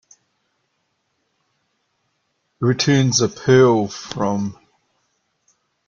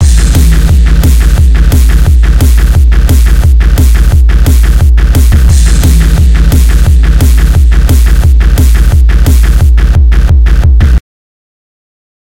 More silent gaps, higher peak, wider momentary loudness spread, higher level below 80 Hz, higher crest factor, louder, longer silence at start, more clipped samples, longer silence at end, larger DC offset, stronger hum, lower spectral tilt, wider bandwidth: neither; about the same, -2 dBFS vs 0 dBFS; first, 12 LU vs 1 LU; second, -56 dBFS vs -4 dBFS; first, 18 dB vs 4 dB; second, -17 LUFS vs -7 LUFS; first, 2.6 s vs 0 s; second, under 0.1% vs 10%; about the same, 1.35 s vs 1.35 s; second, under 0.1% vs 1%; neither; about the same, -5 dB/octave vs -6 dB/octave; second, 7.6 kHz vs 16.5 kHz